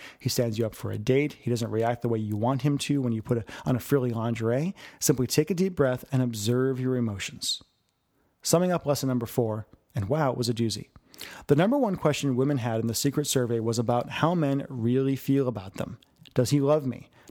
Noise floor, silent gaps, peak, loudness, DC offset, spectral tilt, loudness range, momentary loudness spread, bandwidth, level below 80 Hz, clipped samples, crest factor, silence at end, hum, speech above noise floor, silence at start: -72 dBFS; none; -8 dBFS; -27 LUFS; under 0.1%; -5.5 dB/octave; 2 LU; 8 LU; over 20 kHz; -60 dBFS; under 0.1%; 20 dB; 0.3 s; none; 46 dB; 0 s